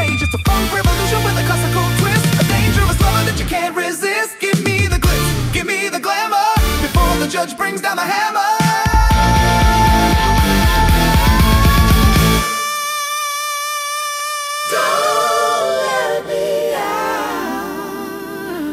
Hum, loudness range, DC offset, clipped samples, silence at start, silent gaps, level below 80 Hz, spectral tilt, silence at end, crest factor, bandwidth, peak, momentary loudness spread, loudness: none; 4 LU; under 0.1%; under 0.1%; 0 s; none; -22 dBFS; -4.5 dB/octave; 0 s; 14 dB; 16.5 kHz; 0 dBFS; 7 LU; -15 LUFS